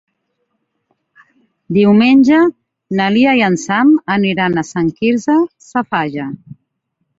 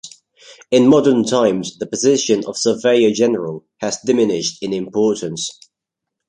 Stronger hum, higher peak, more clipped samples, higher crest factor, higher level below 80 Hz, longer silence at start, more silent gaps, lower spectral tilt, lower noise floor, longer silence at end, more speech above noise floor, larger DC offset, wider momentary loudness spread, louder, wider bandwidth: neither; about the same, 0 dBFS vs -2 dBFS; neither; about the same, 14 dB vs 16 dB; about the same, -56 dBFS vs -60 dBFS; first, 1.7 s vs 0.05 s; neither; first, -6 dB/octave vs -4.5 dB/octave; second, -70 dBFS vs -82 dBFS; about the same, 0.65 s vs 0.75 s; second, 57 dB vs 66 dB; neither; about the same, 12 LU vs 12 LU; first, -13 LUFS vs -16 LUFS; second, 7.8 kHz vs 10.5 kHz